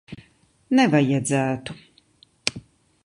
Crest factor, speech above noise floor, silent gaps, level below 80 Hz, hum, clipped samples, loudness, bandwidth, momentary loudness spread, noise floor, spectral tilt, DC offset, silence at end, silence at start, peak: 24 dB; 38 dB; none; -60 dBFS; none; under 0.1%; -22 LUFS; 11.5 kHz; 25 LU; -58 dBFS; -5 dB/octave; under 0.1%; 0.45 s; 0.1 s; 0 dBFS